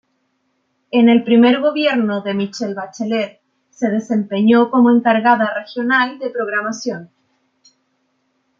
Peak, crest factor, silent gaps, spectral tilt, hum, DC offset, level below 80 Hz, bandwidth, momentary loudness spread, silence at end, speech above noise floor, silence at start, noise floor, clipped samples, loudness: -2 dBFS; 16 dB; none; -5.5 dB/octave; none; under 0.1%; -68 dBFS; 7.4 kHz; 12 LU; 1.55 s; 52 dB; 0.95 s; -67 dBFS; under 0.1%; -16 LUFS